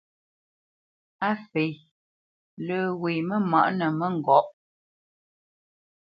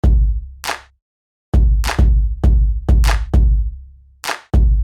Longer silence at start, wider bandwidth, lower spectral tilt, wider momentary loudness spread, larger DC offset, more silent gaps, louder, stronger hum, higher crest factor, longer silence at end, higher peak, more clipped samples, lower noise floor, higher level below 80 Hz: first, 1.2 s vs 0.05 s; second, 5.6 kHz vs 13 kHz; first, -9.5 dB/octave vs -6 dB/octave; about the same, 10 LU vs 10 LU; neither; first, 1.91-2.57 s vs 1.02-1.52 s; second, -25 LUFS vs -18 LUFS; neither; first, 22 dB vs 14 dB; first, 1.55 s vs 0 s; second, -6 dBFS vs -2 dBFS; neither; first, under -90 dBFS vs -38 dBFS; second, -76 dBFS vs -14 dBFS